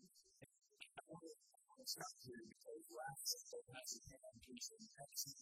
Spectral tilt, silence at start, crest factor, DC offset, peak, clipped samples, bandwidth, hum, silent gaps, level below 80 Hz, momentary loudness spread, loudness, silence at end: -1.5 dB/octave; 0 s; 24 dB; under 0.1%; -30 dBFS; under 0.1%; 15.5 kHz; none; none; -84 dBFS; 20 LU; -52 LUFS; 0 s